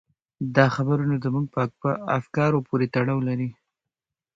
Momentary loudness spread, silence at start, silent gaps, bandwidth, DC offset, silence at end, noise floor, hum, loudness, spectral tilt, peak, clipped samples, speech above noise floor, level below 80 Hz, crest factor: 7 LU; 0.4 s; none; 7.4 kHz; under 0.1%; 0.85 s; -87 dBFS; none; -24 LUFS; -8.5 dB/octave; -2 dBFS; under 0.1%; 64 dB; -58 dBFS; 22 dB